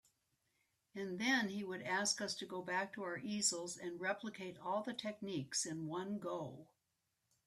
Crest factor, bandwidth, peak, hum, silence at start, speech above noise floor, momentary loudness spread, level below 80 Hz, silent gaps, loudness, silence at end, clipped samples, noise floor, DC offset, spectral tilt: 20 dB; 14.5 kHz; -22 dBFS; none; 0.95 s; 44 dB; 10 LU; -84 dBFS; none; -41 LUFS; 0.85 s; under 0.1%; -86 dBFS; under 0.1%; -2.5 dB/octave